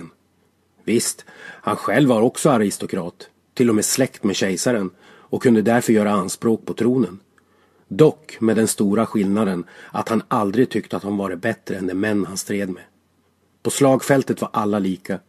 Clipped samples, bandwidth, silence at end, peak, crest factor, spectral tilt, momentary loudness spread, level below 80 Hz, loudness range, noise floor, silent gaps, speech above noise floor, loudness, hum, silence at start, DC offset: under 0.1%; 14.5 kHz; 0.1 s; 0 dBFS; 20 dB; -5 dB/octave; 12 LU; -58 dBFS; 3 LU; -62 dBFS; none; 43 dB; -20 LUFS; none; 0 s; under 0.1%